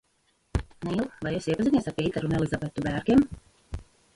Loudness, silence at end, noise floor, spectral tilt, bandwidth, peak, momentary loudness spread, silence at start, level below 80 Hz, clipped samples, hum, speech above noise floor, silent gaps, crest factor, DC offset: -27 LUFS; 0.35 s; -70 dBFS; -7 dB/octave; 11.5 kHz; -8 dBFS; 20 LU; 0.55 s; -44 dBFS; under 0.1%; none; 44 dB; none; 18 dB; under 0.1%